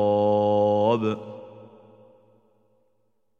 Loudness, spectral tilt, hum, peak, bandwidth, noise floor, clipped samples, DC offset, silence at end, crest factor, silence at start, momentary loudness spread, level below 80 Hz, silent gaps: -22 LUFS; -8.5 dB/octave; none; -10 dBFS; 6.8 kHz; -74 dBFS; under 0.1%; under 0.1%; 1.75 s; 16 dB; 0 s; 18 LU; -72 dBFS; none